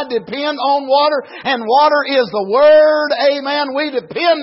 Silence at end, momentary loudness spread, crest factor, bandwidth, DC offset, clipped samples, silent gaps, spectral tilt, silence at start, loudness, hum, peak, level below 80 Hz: 0 s; 10 LU; 12 dB; 5.8 kHz; under 0.1%; under 0.1%; none; -7 dB/octave; 0 s; -14 LUFS; none; -2 dBFS; -64 dBFS